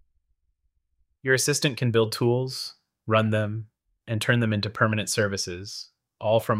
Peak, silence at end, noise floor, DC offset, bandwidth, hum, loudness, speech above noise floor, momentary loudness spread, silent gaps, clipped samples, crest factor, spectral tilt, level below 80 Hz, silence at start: -6 dBFS; 0 s; -73 dBFS; under 0.1%; 16 kHz; none; -25 LUFS; 49 dB; 14 LU; none; under 0.1%; 20 dB; -4.5 dB/octave; -64 dBFS; 1.25 s